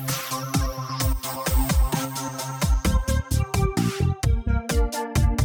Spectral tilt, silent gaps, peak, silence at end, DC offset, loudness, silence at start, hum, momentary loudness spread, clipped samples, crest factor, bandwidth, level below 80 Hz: -5 dB/octave; none; -10 dBFS; 0 s; under 0.1%; -25 LUFS; 0 s; none; 4 LU; under 0.1%; 12 dB; 19 kHz; -26 dBFS